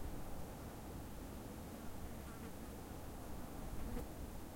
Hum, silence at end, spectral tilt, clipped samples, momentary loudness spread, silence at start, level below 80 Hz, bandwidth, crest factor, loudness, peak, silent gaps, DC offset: none; 0 s; -5.5 dB/octave; under 0.1%; 3 LU; 0 s; -52 dBFS; 16.5 kHz; 16 dB; -51 LUFS; -30 dBFS; none; under 0.1%